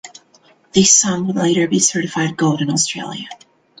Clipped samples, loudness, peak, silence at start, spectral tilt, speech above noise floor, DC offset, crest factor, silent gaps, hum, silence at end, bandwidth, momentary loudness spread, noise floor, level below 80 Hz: under 0.1%; -15 LUFS; 0 dBFS; 0.05 s; -3 dB/octave; 36 dB; under 0.1%; 18 dB; none; none; 0.45 s; 10 kHz; 16 LU; -53 dBFS; -56 dBFS